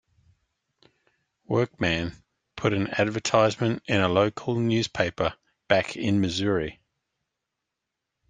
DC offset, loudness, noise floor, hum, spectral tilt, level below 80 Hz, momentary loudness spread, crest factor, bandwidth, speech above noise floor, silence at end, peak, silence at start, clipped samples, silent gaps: under 0.1%; -25 LUFS; -84 dBFS; none; -5.5 dB/octave; -56 dBFS; 7 LU; 24 dB; 9.6 kHz; 60 dB; 1.55 s; -4 dBFS; 1.5 s; under 0.1%; none